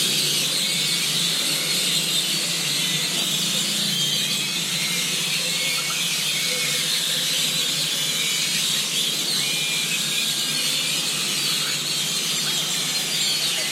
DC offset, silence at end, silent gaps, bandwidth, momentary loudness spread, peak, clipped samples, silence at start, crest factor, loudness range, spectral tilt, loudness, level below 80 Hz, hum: under 0.1%; 0 s; none; 16 kHz; 2 LU; -8 dBFS; under 0.1%; 0 s; 14 dB; 1 LU; -0.5 dB/octave; -20 LUFS; -78 dBFS; none